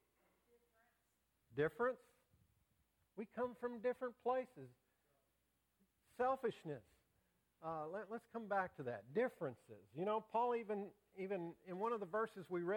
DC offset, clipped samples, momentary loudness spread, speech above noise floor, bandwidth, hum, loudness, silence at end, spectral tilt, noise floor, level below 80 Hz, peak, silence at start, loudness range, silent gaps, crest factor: under 0.1%; under 0.1%; 14 LU; 41 dB; 17 kHz; none; -44 LUFS; 0 s; -7.5 dB/octave; -84 dBFS; -82 dBFS; -26 dBFS; 1.5 s; 4 LU; none; 18 dB